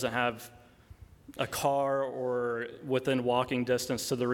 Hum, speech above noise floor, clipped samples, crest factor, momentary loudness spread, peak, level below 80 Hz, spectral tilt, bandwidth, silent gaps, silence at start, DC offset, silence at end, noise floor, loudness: none; 23 dB; under 0.1%; 18 dB; 8 LU; -14 dBFS; -62 dBFS; -4.5 dB/octave; 19 kHz; none; 0 s; under 0.1%; 0 s; -54 dBFS; -31 LUFS